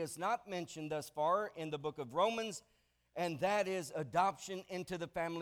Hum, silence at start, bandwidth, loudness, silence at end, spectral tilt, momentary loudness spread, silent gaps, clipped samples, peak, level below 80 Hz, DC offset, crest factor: none; 0 s; 19 kHz; -38 LUFS; 0 s; -4.5 dB/octave; 9 LU; none; under 0.1%; -20 dBFS; -74 dBFS; under 0.1%; 18 dB